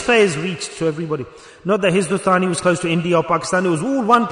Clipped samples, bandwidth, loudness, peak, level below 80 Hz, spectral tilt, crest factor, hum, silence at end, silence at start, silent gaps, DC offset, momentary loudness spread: under 0.1%; 11 kHz; -18 LUFS; -2 dBFS; -54 dBFS; -5 dB/octave; 14 dB; none; 0 s; 0 s; none; under 0.1%; 10 LU